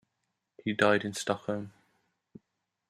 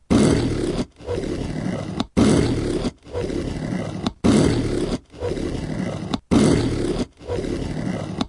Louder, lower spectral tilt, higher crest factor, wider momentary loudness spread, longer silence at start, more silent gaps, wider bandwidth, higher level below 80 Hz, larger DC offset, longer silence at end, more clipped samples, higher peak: second, -30 LUFS vs -22 LUFS; second, -4.5 dB/octave vs -6 dB/octave; first, 24 dB vs 18 dB; about the same, 12 LU vs 11 LU; first, 0.65 s vs 0.1 s; neither; first, 14 kHz vs 11.5 kHz; second, -74 dBFS vs -34 dBFS; neither; first, 1.2 s vs 0 s; neither; second, -8 dBFS vs -4 dBFS